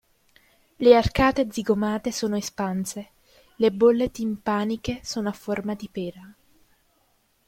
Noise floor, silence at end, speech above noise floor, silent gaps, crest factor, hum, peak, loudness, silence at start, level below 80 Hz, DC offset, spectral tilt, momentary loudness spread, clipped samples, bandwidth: -66 dBFS; 1.15 s; 43 dB; none; 22 dB; none; -2 dBFS; -24 LUFS; 0.8 s; -44 dBFS; under 0.1%; -5.5 dB/octave; 14 LU; under 0.1%; 16.5 kHz